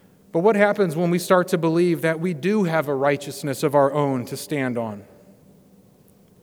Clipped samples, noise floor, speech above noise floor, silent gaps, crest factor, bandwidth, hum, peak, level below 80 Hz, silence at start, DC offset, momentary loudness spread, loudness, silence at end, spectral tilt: under 0.1%; -54 dBFS; 33 dB; none; 18 dB; over 20 kHz; none; -2 dBFS; -70 dBFS; 0.35 s; under 0.1%; 9 LU; -21 LUFS; 1.4 s; -6 dB/octave